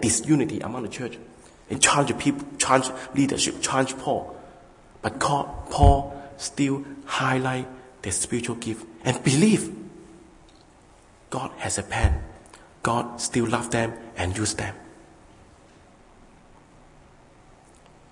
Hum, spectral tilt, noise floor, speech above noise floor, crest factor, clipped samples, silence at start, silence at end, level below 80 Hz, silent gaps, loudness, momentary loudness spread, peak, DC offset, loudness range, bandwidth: none; -4 dB/octave; -53 dBFS; 29 dB; 24 dB; under 0.1%; 0 s; 3.2 s; -38 dBFS; none; -25 LUFS; 15 LU; -2 dBFS; under 0.1%; 7 LU; 11 kHz